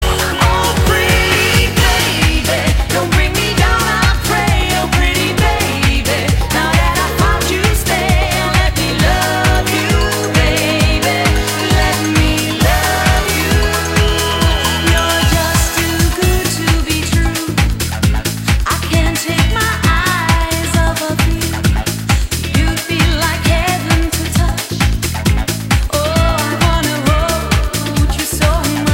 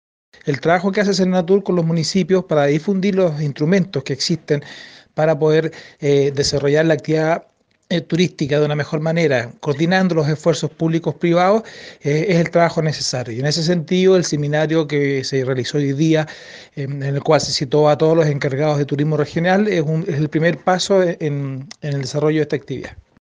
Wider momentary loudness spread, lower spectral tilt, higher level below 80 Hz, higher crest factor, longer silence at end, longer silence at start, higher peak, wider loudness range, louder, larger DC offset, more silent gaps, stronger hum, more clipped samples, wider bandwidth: second, 3 LU vs 9 LU; second, -4 dB/octave vs -6 dB/octave; first, -18 dBFS vs -54 dBFS; about the same, 12 dB vs 16 dB; second, 0 s vs 0.4 s; second, 0 s vs 0.45 s; about the same, 0 dBFS vs 0 dBFS; about the same, 2 LU vs 2 LU; first, -13 LUFS vs -18 LUFS; neither; neither; neither; neither; first, 16.5 kHz vs 9.8 kHz